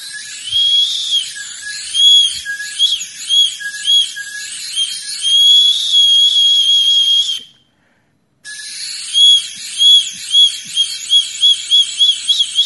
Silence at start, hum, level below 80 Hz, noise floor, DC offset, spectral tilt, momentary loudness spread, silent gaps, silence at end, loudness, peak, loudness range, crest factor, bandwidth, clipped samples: 0 s; none; -64 dBFS; -59 dBFS; under 0.1%; 4.5 dB/octave; 17 LU; none; 0 s; -10 LUFS; 0 dBFS; 3 LU; 14 dB; 12 kHz; under 0.1%